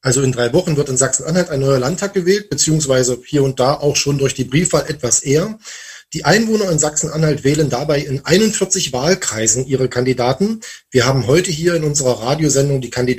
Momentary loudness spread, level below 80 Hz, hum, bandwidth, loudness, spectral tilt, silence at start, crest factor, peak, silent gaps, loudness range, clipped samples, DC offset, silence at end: 5 LU; -42 dBFS; none; 15.5 kHz; -15 LUFS; -4 dB/octave; 0.05 s; 16 dB; 0 dBFS; none; 1 LU; under 0.1%; under 0.1%; 0 s